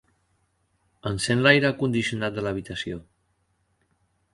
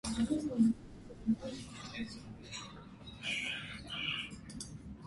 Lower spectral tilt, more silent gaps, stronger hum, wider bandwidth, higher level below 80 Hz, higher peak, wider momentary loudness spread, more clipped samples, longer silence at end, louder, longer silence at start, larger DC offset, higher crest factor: about the same, -5 dB/octave vs -4 dB/octave; neither; neither; about the same, 11.5 kHz vs 11.5 kHz; about the same, -54 dBFS vs -58 dBFS; first, -2 dBFS vs -20 dBFS; about the same, 16 LU vs 16 LU; neither; first, 1.3 s vs 0 s; first, -24 LUFS vs -38 LUFS; first, 1.05 s vs 0.05 s; neither; about the same, 24 dB vs 20 dB